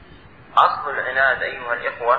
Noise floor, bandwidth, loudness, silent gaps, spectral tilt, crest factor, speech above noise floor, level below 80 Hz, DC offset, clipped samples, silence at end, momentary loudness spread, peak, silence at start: -45 dBFS; 8 kHz; -20 LUFS; none; -4.5 dB/octave; 18 dB; 25 dB; -54 dBFS; 0.2%; under 0.1%; 0 s; 7 LU; -2 dBFS; 0.1 s